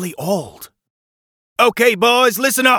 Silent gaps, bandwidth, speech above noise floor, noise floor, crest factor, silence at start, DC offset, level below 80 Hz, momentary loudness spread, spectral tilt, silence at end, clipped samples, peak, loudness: 0.90-1.56 s; 20 kHz; over 75 dB; under -90 dBFS; 16 dB; 0 s; under 0.1%; -62 dBFS; 13 LU; -2.5 dB/octave; 0 s; under 0.1%; 0 dBFS; -14 LUFS